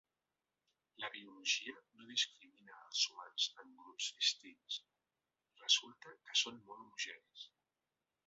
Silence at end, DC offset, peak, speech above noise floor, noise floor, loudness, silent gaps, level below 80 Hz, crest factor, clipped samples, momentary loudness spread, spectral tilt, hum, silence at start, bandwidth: 0.8 s; under 0.1%; -18 dBFS; over 47 dB; under -90 dBFS; -39 LUFS; none; under -90 dBFS; 26 dB; under 0.1%; 22 LU; 3 dB/octave; none; 1 s; 7.6 kHz